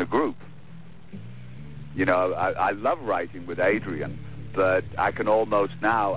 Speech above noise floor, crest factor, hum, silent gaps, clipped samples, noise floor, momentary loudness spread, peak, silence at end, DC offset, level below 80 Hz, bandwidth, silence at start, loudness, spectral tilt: 22 dB; 16 dB; none; none; under 0.1%; -46 dBFS; 20 LU; -10 dBFS; 0 s; 0.9%; -52 dBFS; 4 kHz; 0 s; -25 LUFS; -10 dB/octave